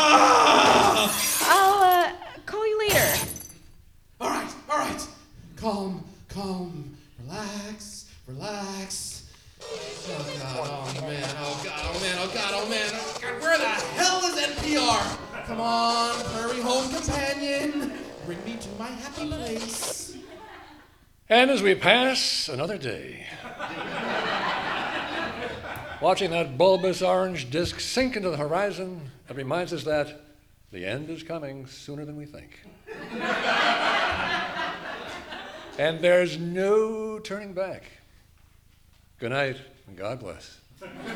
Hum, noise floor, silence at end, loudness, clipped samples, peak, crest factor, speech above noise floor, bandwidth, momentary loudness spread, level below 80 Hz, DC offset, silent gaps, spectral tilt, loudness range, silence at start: none; -57 dBFS; 0 s; -25 LUFS; under 0.1%; -2 dBFS; 24 dB; 31 dB; over 20 kHz; 19 LU; -52 dBFS; under 0.1%; none; -3 dB/octave; 11 LU; 0 s